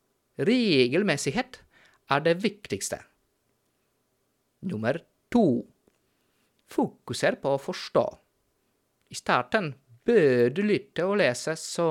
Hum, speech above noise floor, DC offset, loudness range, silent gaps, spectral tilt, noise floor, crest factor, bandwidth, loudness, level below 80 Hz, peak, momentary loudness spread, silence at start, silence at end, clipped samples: none; 48 dB; under 0.1%; 5 LU; none; -5 dB/octave; -73 dBFS; 20 dB; 16 kHz; -26 LUFS; -66 dBFS; -6 dBFS; 13 LU; 0.4 s; 0 s; under 0.1%